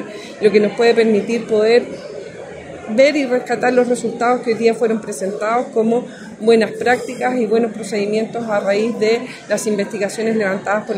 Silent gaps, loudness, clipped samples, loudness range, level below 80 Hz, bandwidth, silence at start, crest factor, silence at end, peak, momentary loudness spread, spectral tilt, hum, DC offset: none; -17 LUFS; under 0.1%; 2 LU; -64 dBFS; 15 kHz; 0 s; 16 dB; 0 s; 0 dBFS; 9 LU; -5 dB/octave; none; under 0.1%